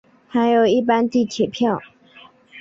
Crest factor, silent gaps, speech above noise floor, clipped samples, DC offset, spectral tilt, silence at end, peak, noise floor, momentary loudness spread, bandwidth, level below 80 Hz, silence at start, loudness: 14 dB; none; 30 dB; under 0.1%; under 0.1%; -5.5 dB/octave; 0 s; -6 dBFS; -48 dBFS; 7 LU; 7.6 kHz; -62 dBFS; 0.35 s; -19 LUFS